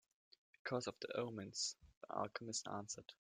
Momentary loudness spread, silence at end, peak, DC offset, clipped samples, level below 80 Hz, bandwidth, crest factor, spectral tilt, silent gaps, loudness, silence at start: 8 LU; 0.2 s; -26 dBFS; under 0.1%; under 0.1%; -80 dBFS; 14 kHz; 22 dB; -3 dB/octave; 1.97-2.01 s; -46 LUFS; 0.65 s